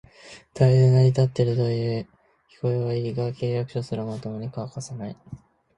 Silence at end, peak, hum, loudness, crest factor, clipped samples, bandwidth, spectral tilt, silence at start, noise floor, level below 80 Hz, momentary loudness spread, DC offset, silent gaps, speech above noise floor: 0.4 s; -6 dBFS; none; -24 LUFS; 18 dB; under 0.1%; 9.4 kHz; -8 dB/octave; 0.25 s; -48 dBFS; -56 dBFS; 20 LU; under 0.1%; none; 25 dB